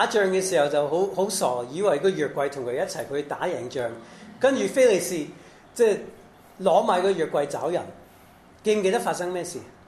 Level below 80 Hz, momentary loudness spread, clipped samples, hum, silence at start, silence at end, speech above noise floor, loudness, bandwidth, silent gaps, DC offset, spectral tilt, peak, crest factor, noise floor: -64 dBFS; 12 LU; under 0.1%; none; 0 s; 0.2 s; 28 dB; -24 LUFS; 14 kHz; none; under 0.1%; -4 dB/octave; -6 dBFS; 18 dB; -52 dBFS